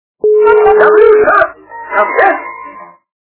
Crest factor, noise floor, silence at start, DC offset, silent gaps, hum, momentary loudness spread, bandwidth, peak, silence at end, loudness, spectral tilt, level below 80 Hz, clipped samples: 10 dB; -32 dBFS; 0.25 s; under 0.1%; none; 50 Hz at -60 dBFS; 16 LU; 4 kHz; 0 dBFS; 0.4 s; -8 LUFS; -8 dB/octave; -46 dBFS; 1%